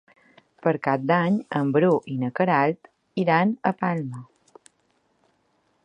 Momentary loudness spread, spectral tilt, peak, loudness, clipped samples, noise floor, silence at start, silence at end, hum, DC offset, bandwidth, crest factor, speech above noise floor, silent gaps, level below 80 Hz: 10 LU; -8.5 dB/octave; -6 dBFS; -23 LUFS; under 0.1%; -68 dBFS; 0.65 s; 1.6 s; none; under 0.1%; 9.6 kHz; 20 dB; 46 dB; none; -72 dBFS